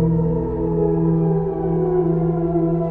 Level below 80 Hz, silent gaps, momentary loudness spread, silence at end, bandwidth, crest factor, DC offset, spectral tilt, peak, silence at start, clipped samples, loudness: -34 dBFS; none; 3 LU; 0 s; 2.4 kHz; 12 dB; under 0.1%; -13.5 dB/octave; -6 dBFS; 0 s; under 0.1%; -19 LUFS